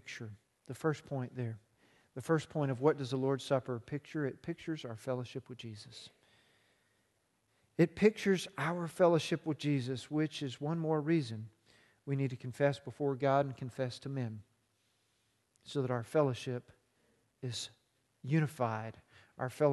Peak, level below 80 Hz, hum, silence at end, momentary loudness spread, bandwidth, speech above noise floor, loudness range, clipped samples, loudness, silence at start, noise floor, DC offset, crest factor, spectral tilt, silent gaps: -14 dBFS; -74 dBFS; none; 0 s; 16 LU; 12.5 kHz; 43 dB; 7 LU; under 0.1%; -35 LUFS; 0.05 s; -77 dBFS; under 0.1%; 22 dB; -6.5 dB/octave; none